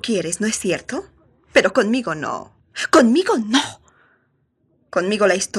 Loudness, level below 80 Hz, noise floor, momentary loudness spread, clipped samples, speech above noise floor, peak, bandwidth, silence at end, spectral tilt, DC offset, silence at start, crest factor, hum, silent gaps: -19 LUFS; -58 dBFS; -65 dBFS; 15 LU; under 0.1%; 47 dB; 0 dBFS; 13.5 kHz; 0 s; -3.5 dB/octave; under 0.1%; 0.05 s; 18 dB; none; none